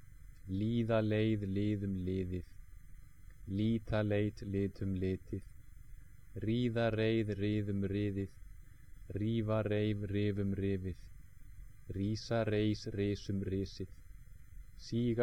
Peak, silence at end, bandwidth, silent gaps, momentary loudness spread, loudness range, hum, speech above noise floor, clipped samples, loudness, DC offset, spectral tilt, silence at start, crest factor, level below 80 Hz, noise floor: -20 dBFS; 0 s; 9.8 kHz; none; 13 LU; 2 LU; none; 20 dB; under 0.1%; -36 LUFS; 0.2%; -8 dB/octave; 0.05 s; 16 dB; -54 dBFS; -55 dBFS